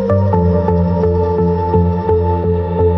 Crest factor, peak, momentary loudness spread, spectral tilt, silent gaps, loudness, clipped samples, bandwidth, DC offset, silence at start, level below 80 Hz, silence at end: 12 dB; -2 dBFS; 2 LU; -11.5 dB/octave; none; -14 LUFS; under 0.1%; 5.6 kHz; under 0.1%; 0 s; -32 dBFS; 0 s